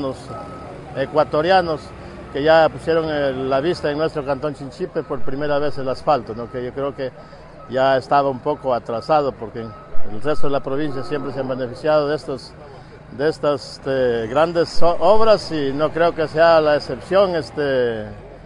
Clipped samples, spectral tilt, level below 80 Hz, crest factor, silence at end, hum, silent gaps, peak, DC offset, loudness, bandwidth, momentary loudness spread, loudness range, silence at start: under 0.1%; -6 dB/octave; -42 dBFS; 18 dB; 0.05 s; none; none; 0 dBFS; under 0.1%; -20 LUFS; 11 kHz; 16 LU; 6 LU; 0 s